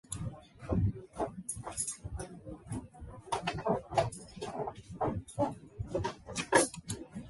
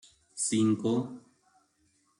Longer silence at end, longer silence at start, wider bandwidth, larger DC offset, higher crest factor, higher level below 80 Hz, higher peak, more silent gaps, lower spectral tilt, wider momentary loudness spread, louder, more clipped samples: second, 0 s vs 1 s; second, 0.1 s vs 0.35 s; about the same, 12 kHz vs 11.5 kHz; neither; first, 26 dB vs 16 dB; first, -50 dBFS vs -74 dBFS; first, -10 dBFS vs -16 dBFS; neither; about the same, -4.5 dB/octave vs -5 dB/octave; second, 14 LU vs 20 LU; second, -36 LUFS vs -29 LUFS; neither